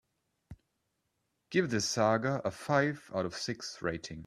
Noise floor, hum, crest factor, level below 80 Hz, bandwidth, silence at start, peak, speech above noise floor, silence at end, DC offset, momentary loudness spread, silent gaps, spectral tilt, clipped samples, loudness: -81 dBFS; none; 22 dB; -66 dBFS; 13.5 kHz; 0.5 s; -12 dBFS; 49 dB; 0.05 s; under 0.1%; 9 LU; none; -4.5 dB/octave; under 0.1%; -32 LUFS